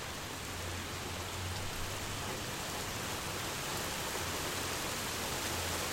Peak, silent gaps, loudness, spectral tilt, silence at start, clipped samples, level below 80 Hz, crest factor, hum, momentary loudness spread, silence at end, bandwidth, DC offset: -22 dBFS; none; -37 LUFS; -2.5 dB/octave; 0 s; under 0.1%; -52 dBFS; 16 dB; none; 4 LU; 0 s; 16.5 kHz; under 0.1%